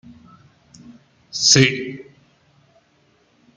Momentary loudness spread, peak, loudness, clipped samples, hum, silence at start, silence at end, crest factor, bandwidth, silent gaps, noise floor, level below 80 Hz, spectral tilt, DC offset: 21 LU; 0 dBFS; -15 LUFS; under 0.1%; none; 0.9 s; 1.55 s; 24 dB; 10.5 kHz; none; -60 dBFS; -58 dBFS; -2.5 dB/octave; under 0.1%